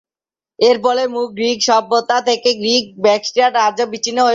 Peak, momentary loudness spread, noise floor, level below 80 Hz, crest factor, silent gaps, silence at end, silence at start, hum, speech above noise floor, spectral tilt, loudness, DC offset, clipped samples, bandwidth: -2 dBFS; 5 LU; under -90 dBFS; -64 dBFS; 14 dB; none; 0 s; 0.6 s; none; over 75 dB; -2 dB/octave; -15 LUFS; under 0.1%; under 0.1%; 7.8 kHz